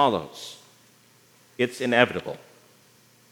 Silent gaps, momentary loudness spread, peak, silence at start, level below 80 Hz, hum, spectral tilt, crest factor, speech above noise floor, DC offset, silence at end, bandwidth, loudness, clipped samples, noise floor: none; 22 LU; -2 dBFS; 0 s; -70 dBFS; none; -4.5 dB/octave; 26 dB; 33 dB; under 0.1%; 0.95 s; over 20 kHz; -24 LUFS; under 0.1%; -58 dBFS